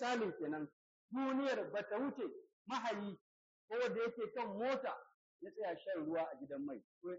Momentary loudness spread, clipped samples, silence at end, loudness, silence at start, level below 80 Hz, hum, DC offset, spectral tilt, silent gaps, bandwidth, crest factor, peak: 12 LU; under 0.1%; 0 s; -42 LUFS; 0 s; -88 dBFS; none; under 0.1%; -3.5 dB/octave; 0.73-1.09 s, 2.53-2.65 s, 3.21-3.68 s, 5.14-5.39 s, 6.84-7.01 s; 7.6 kHz; 16 dB; -28 dBFS